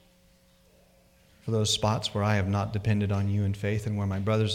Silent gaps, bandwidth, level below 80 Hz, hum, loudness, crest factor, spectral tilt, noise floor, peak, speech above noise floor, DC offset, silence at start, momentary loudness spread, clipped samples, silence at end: none; 14 kHz; -54 dBFS; none; -28 LUFS; 16 dB; -5.5 dB/octave; -61 dBFS; -12 dBFS; 34 dB; under 0.1%; 1.45 s; 5 LU; under 0.1%; 0 s